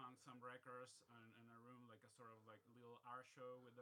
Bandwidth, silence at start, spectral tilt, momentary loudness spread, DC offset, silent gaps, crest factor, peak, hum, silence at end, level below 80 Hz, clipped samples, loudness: 13 kHz; 0 s; -4.5 dB/octave; 8 LU; under 0.1%; none; 18 dB; -44 dBFS; none; 0 s; under -90 dBFS; under 0.1%; -62 LUFS